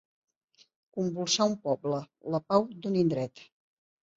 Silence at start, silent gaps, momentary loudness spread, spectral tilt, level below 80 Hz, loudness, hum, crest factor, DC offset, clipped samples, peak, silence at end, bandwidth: 0.95 s; none; 8 LU; -5 dB/octave; -72 dBFS; -30 LUFS; none; 20 dB; under 0.1%; under 0.1%; -10 dBFS; 0.75 s; 8 kHz